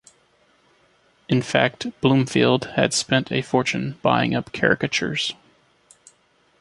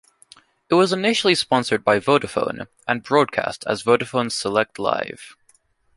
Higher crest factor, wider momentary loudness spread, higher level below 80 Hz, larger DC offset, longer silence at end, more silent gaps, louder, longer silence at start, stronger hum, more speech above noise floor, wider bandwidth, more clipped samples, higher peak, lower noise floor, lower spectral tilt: about the same, 20 dB vs 20 dB; second, 5 LU vs 8 LU; about the same, -56 dBFS vs -60 dBFS; neither; first, 1.25 s vs 0.65 s; neither; about the same, -21 LUFS vs -20 LUFS; first, 1.3 s vs 0.7 s; neither; about the same, 41 dB vs 40 dB; about the same, 11.5 kHz vs 11.5 kHz; neither; about the same, -2 dBFS vs -2 dBFS; about the same, -61 dBFS vs -60 dBFS; about the same, -4.5 dB/octave vs -4 dB/octave